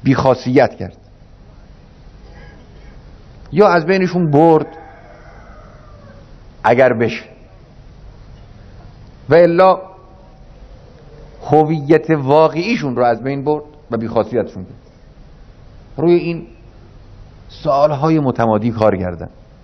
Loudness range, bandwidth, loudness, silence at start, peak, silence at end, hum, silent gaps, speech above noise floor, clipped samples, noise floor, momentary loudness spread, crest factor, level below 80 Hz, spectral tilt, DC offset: 5 LU; 6.4 kHz; -14 LUFS; 0 s; 0 dBFS; 0.35 s; none; none; 28 dB; 0.1%; -41 dBFS; 17 LU; 16 dB; -42 dBFS; -8 dB/octave; under 0.1%